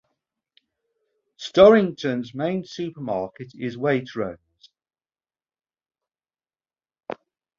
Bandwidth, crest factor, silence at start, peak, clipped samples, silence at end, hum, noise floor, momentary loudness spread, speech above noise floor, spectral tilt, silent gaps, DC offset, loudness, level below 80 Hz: 7.4 kHz; 24 dB; 1.4 s; 0 dBFS; under 0.1%; 0.45 s; none; under -90 dBFS; 24 LU; over 69 dB; -6.5 dB/octave; none; under 0.1%; -22 LUFS; -60 dBFS